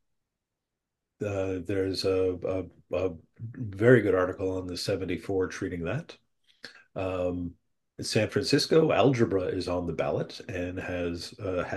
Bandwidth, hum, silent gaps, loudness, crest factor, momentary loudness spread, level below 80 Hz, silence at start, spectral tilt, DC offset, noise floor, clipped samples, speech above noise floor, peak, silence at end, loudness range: 12.5 kHz; none; none; -28 LUFS; 22 dB; 15 LU; -58 dBFS; 1.2 s; -5.5 dB/octave; under 0.1%; -86 dBFS; under 0.1%; 58 dB; -6 dBFS; 0 s; 6 LU